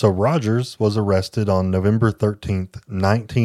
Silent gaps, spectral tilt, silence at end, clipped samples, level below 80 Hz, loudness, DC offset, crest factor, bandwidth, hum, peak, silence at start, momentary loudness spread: none; -7.5 dB/octave; 0 s; under 0.1%; -46 dBFS; -20 LUFS; under 0.1%; 18 dB; 12.5 kHz; none; -2 dBFS; 0 s; 7 LU